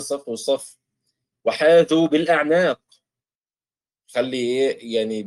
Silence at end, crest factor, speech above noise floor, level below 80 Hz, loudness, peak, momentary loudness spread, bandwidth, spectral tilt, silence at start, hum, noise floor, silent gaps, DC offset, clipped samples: 0 s; 16 dB; over 70 dB; -70 dBFS; -20 LUFS; -6 dBFS; 12 LU; 12.5 kHz; -4.5 dB/octave; 0 s; none; under -90 dBFS; 3.35-3.42 s; under 0.1%; under 0.1%